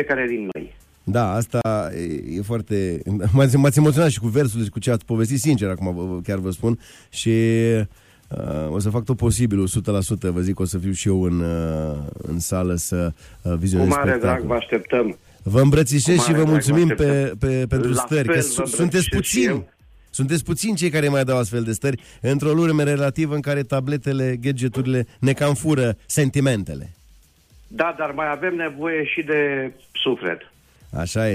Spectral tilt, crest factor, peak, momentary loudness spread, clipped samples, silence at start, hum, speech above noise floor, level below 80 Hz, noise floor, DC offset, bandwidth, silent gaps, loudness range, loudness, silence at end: -5.5 dB/octave; 16 dB; -4 dBFS; 11 LU; under 0.1%; 0 s; none; 32 dB; -42 dBFS; -52 dBFS; under 0.1%; 15.5 kHz; none; 5 LU; -21 LUFS; 0 s